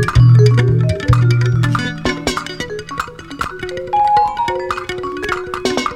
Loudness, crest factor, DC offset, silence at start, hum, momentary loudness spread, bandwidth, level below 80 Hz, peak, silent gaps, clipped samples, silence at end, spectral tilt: -16 LUFS; 14 dB; under 0.1%; 0 s; none; 15 LU; 11 kHz; -30 dBFS; 0 dBFS; none; under 0.1%; 0 s; -6.5 dB/octave